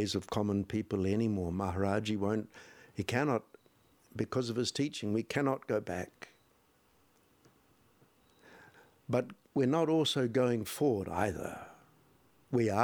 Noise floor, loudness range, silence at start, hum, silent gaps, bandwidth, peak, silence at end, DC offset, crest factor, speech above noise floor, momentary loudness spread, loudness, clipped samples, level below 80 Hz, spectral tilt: -69 dBFS; 10 LU; 0 s; none; none; over 20 kHz; -12 dBFS; 0 s; under 0.1%; 22 dB; 36 dB; 16 LU; -33 LUFS; under 0.1%; -64 dBFS; -6 dB/octave